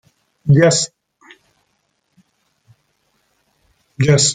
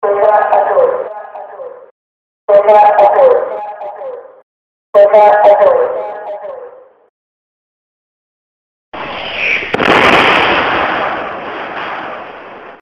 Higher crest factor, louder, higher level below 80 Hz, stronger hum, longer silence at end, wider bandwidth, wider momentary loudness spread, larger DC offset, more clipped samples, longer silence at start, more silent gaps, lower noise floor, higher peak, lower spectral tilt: first, 18 dB vs 12 dB; second, -15 LUFS vs -10 LUFS; second, -54 dBFS vs -48 dBFS; neither; about the same, 0 s vs 0.05 s; about the same, 9.6 kHz vs 9.2 kHz; second, 13 LU vs 22 LU; neither; second, under 0.1% vs 0.1%; first, 0.45 s vs 0 s; second, none vs 1.91-2.48 s, 4.43-4.93 s, 7.09-8.92 s; first, -67 dBFS vs -35 dBFS; about the same, -2 dBFS vs 0 dBFS; about the same, -4.5 dB/octave vs -4.5 dB/octave